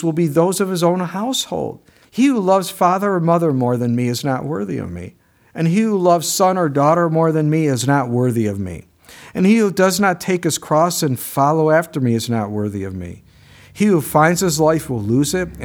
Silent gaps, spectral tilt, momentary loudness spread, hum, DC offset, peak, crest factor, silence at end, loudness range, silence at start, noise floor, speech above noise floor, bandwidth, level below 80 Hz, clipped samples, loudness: none; -5.5 dB/octave; 11 LU; none; under 0.1%; 0 dBFS; 16 dB; 0 s; 2 LU; 0 s; -45 dBFS; 29 dB; over 20 kHz; -50 dBFS; under 0.1%; -17 LUFS